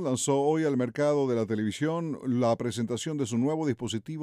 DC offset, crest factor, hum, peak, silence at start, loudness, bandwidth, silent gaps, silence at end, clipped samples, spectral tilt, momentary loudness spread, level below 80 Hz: under 0.1%; 14 dB; none; -14 dBFS; 0 s; -28 LUFS; 14.5 kHz; none; 0 s; under 0.1%; -5.5 dB/octave; 6 LU; -68 dBFS